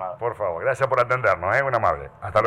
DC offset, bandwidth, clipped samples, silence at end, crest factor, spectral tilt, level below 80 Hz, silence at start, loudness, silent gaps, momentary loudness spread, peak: under 0.1%; 11.5 kHz; under 0.1%; 0 s; 16 dB; -6 dB/octave; -50 dBFS; 0 s; -22 LUFS; none; 7 LU; -6 dBFS